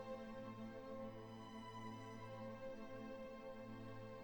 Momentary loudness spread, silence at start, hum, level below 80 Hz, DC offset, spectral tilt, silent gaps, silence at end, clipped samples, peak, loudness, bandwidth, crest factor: 2 LU; 0 s; none; -70 dBFS; under 0.1%; -6.5 dB/octave; none; 0 s; under 0.1%; -40 dBFS; -53 LUFS; 19 kHz; 14 dB